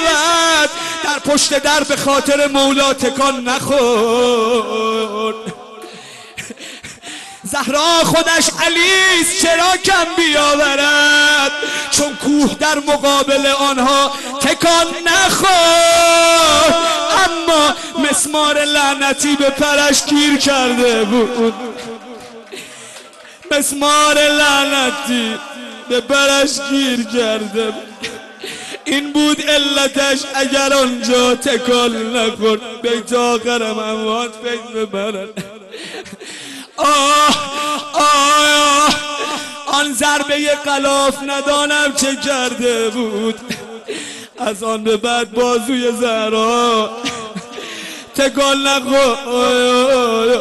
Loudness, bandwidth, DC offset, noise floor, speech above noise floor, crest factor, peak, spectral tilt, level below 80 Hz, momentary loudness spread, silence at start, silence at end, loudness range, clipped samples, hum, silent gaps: -13 LUFS; 12.5 kHz; under 0.1%; -37 dBFS; 23 dB; 12 dB; -2 dBFS; -1.5 dB/octave; -48 dBFS; 18 LU; 0 s; 0 s; 7 LU; under 0.1%; none; none